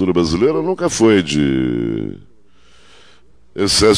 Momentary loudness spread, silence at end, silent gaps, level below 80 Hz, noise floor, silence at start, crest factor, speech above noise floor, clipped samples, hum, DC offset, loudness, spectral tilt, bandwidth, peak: 11 LU; 0 s; none; -40 dBFS; -53 dBFS; 0 s; 16 dB; 38 dB; under 0.1%; none; 0.7%; -16 LUFS; -4.5 dB/octave; 11 kHz; 0 dBFS